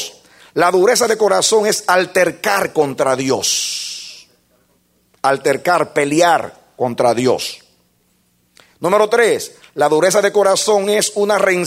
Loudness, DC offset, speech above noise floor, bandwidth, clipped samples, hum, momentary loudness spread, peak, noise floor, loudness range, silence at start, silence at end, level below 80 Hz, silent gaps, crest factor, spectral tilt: -15 LUFS; under 0.1%; 45 dB; 16 kHz; under 0.1%; none; 10 LU; 0 dBFS; -60 dBFS; 4 LU; 0 s; 0 s; -62 dBFS; none; 16 dB; -3 dB/octave